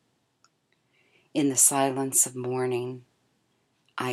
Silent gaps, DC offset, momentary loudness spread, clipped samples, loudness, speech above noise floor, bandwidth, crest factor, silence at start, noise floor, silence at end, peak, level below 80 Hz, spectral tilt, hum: none; under 0.1%; 18 LU; under 0.1%; -24 LUFS; 46 dB; 18 kHz; 22 dB; 1.35 s; -71 dBFS; 0 s; -6 dBFS; -86 dBFS; -3 dB/octave; none